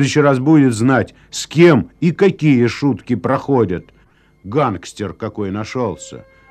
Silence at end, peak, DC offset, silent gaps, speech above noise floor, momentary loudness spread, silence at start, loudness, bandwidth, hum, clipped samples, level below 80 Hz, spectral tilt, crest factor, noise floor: 0.3 s; 0 dBFS; under 0.1%; none; 37 dB; 14 LU; 0 s; -16 LUFS; 12.5 kHz; none; under 0.1%; -50 dBFS; -6.5 dB/octave; 16 dB; -52 dBFS